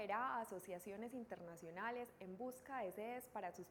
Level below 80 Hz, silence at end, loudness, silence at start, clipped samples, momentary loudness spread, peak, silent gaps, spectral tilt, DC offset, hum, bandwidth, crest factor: -82 dBFS; 0 s; -49 LUFS; 0 s; under 0.1%; 9 LU; -30 dBFS; none; -5 dB/octave; under 0.1%; none; 19 kHz; 18 dB